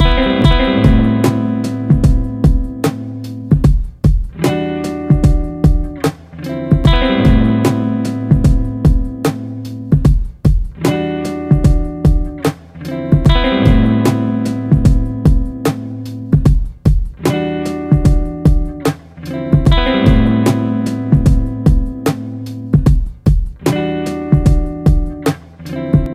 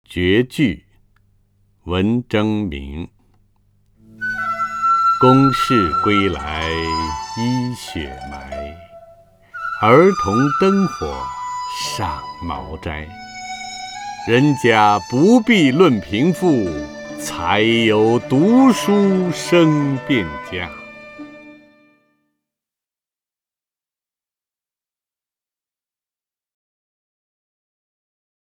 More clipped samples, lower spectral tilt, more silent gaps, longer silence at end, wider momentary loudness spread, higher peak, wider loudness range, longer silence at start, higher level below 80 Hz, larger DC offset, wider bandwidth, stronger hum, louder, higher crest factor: neither; first, -7.5 dB/octave vs -6 dB/octave; neither; second, 0 s vs 6.95 s; second, 9 LU vs 18 LU; about the same, 0 dBFS vs 0 dBFS; second, 2 LU vs 9 LU; about the same, 0 s vs 0.1 s; first, -18 dBFS vs -42 dBFS; neither; about the same, 15 kHz vs 16 kHz; neither; about the same, -14 LUFS vs -16 LUFS; second, 12 dB vs 18 dB